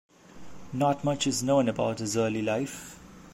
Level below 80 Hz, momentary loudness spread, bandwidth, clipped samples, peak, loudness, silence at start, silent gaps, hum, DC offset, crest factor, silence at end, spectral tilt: -60 dBFS; 16 LU; 16 kHz; under 0.1%; -12 dBFS; -27 LUFS; 0.35 s; none; none; under 0.1%; 16 dB; 0 s; -5 dB/octave